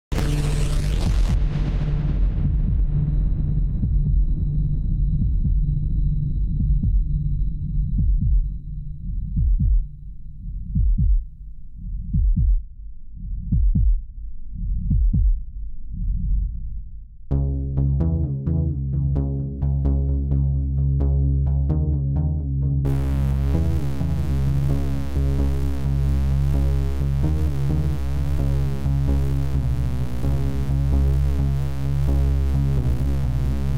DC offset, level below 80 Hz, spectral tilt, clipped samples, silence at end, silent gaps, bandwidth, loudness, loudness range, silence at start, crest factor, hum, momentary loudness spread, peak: under 0.1%; -22 dBFS; -8.5 dB/octave; under 0.1%; 0 s; none; 11 kHz; -23 LUFS; 4 LU; 0.1 s; 10 dB; none; 11 LU; -10 dBFS